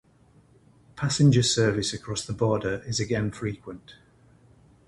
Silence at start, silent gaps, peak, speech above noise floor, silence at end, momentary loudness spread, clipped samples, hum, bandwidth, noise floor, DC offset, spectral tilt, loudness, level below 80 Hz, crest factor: 0.95 s; none; -8 dBFS; 33 dB; 0.95 s; 14 LU; under 0.1%; none; 11.5 kHz; -58 dBFS; under 0.1%; -5 dB/octave; -25 LUFS; -52 dBFS; 18 dB